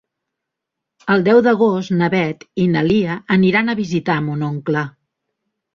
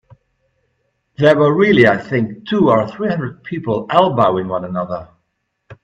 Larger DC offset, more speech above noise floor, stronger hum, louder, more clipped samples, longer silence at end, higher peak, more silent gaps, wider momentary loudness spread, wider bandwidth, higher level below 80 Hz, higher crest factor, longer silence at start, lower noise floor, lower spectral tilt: neither; first, 65 dB vs 55 dB; neither; about the same, -17 LUFS vs -15 LUFS; neither; first, 0.85 s vs 0.1 s; about the same, -2 dBFS vs 0 dBFS; neither; about the same, 9 LU vs 11 LU; second, 7.2 kHz vs 8.4 kHz; about the same, -54 dBFS vs -54 dBFS; about the same, 16 dB vs 16 dB; second, 1.05 s vs 1.2 s; first, -81 dBFS vs -70 dBFS; about the same, -7.5 dB/octave vs -8 dB/octave